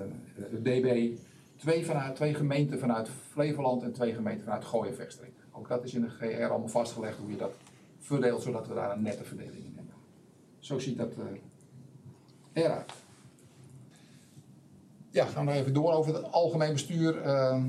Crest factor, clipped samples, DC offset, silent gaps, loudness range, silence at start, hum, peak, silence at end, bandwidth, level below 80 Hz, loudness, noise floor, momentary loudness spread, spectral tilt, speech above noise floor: 20 dB; under 0.1%; under 0.1%; none; 8 LU; 0 s; none; -12 dBFS; 0 s; 13.5 kHz; -80 dBFS; -31 LUFS; -58 dBFS; 18 LU; -6.5 dB/octave; 28 dB